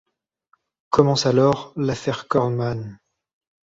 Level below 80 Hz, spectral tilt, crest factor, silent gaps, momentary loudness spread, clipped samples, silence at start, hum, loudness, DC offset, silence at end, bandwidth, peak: -54 dBFS; -6 dB/octave; 20 dB; none; 10 LU; under 0.1%; 0.9 s; none; -21 LUFS; under 0.1%; 0.65 s; 8 kHz; -2 dBFS